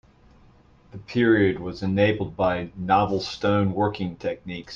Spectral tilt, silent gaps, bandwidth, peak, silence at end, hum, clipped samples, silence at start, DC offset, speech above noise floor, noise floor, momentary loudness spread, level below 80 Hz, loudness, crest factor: -7 dB/octave; none; 7.4 kHz; -6 dBFS; 0 s; none; under 0.1%; 0.95 s; under 0.1%; 31 dB; -54 dBFS; 10 LU; -52 dBFS; -24 LUFS; 18 dB